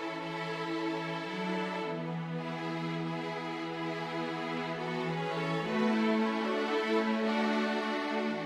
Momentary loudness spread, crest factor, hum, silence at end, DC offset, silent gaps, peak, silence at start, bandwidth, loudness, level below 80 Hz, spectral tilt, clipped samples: 7 LU; 16 dB; none; 0 s; under 0.1%; none; -18 dBFS; 0 s; 11.5 kHz; -33 LUFS; -78 dBFS; -6 dB/octave; under 0.1%